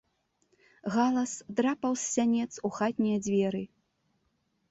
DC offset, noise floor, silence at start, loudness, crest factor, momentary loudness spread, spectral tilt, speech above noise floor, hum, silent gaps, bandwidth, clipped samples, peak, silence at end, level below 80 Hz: under 0.1%; -75 dBFS; 0.85 s; -29 LUFS; 16 dB; 7 LU; -5 dB/octave; 46 dB; none; none; 8.2 kHz; under 0.1%; -14 dBFS; 1.05 s; -70 dBFS